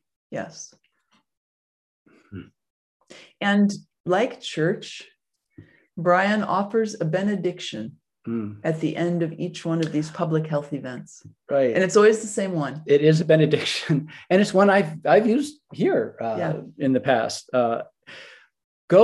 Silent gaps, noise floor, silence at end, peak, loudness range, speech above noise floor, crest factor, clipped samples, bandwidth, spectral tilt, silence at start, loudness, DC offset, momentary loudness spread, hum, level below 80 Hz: 1.37-2.05 s, 2.70-3.00 s, 4.00-4.04 s, 18.64-18.88 s; -67 dBFS; 0 s; -4 dBFS; 7 LU; 45 dB; 18 dB; under 0.1%; 12 kHz; -6 dB/octave; 0.3 s; -22 LUFS; under 0.1%; 19 LU; none; -70 dBFS